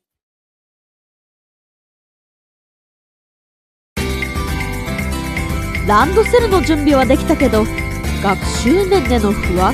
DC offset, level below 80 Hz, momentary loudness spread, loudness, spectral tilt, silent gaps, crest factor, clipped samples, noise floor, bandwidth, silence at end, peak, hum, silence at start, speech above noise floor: under 0.1%; -26 dBFS; 9 LU; -15 LUFS; -5.5 dB/octave; none; 16 dB; under 0.1%; under -90 dBFS; 14.5 kHz; 0 s; 0 dBFS; none; 3.95 s; over 77 dB